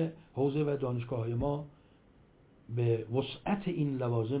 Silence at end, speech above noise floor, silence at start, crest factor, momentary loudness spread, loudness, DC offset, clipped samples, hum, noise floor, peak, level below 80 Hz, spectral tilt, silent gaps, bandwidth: 0 s; 30 dB; 0 s; 16 dB; 5 LU; -33 LUFS; under 0.1%; under 0.1%; none; -62 dBFS; -18 dBFS; -58 dBFS; -7.5 dB/octave; none; 4 kHz